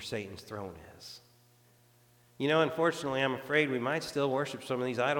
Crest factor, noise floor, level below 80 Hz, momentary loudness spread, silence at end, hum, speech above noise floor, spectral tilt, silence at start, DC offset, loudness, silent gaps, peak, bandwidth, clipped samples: 20 dB; -64 dBFS; -70 dBFS; 20 LU; 0 s; none; 32 dB; -5 dB/octave; 0 s; under 0.1%; -31 LUFS; none; -14 dBFS; 19 kHz; under 0.1%